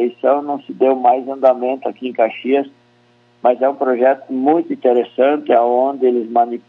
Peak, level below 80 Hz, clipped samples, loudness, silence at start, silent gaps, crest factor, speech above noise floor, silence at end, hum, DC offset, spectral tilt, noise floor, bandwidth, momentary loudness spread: 0 dBFS; -78 dBFS; under 0.1%; -16 LUFS; 0 s; none; 16 dB; 38 dB; 0.1 s; none; under 0.1%; -8 dB/octave; -54 dBFS; 4.3 kHz; 5 LU